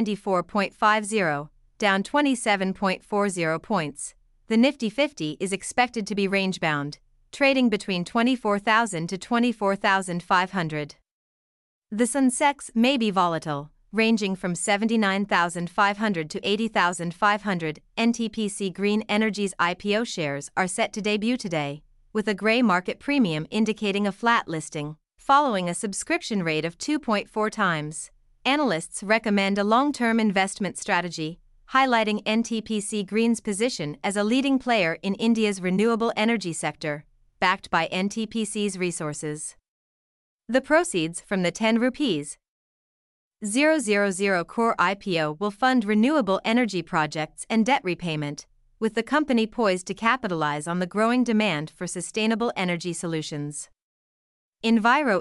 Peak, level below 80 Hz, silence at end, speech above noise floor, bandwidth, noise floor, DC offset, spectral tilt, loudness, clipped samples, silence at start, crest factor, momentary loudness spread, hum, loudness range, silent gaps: -6 dBFS; -60 dBFS; 0 s; over 66 dB; 12 kHz; under -90 dBFS; under 0.1%; -4.5 dB/octave; -24 LUFS; under 0.1%; 0 s; 18 dB; 9 LU; none; 3 LU; 11.11-11.82 s, 39.68-40.39 s, 42.48-43.31 s, 53.82-54.53 s